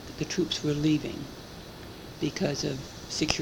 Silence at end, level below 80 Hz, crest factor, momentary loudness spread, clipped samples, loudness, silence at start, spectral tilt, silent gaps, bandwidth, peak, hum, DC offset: 0 s; -52 dBFS; 26 dB; 16 LU; under 0.1%; -30 LUFS; 0 s; -4.5 dB/octave; none; 19 kHz; -4 dBFS; none; under 0.1%